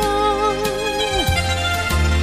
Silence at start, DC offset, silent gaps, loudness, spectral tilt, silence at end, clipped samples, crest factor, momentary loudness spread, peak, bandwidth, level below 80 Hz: 0 s; under 0.1%; none; -19 LUFS; -4 dB/octave; 0 s; under 0.1%; 14 dB; 3 LU; -4 dBFS; 15.5 kHz; -26 dBFS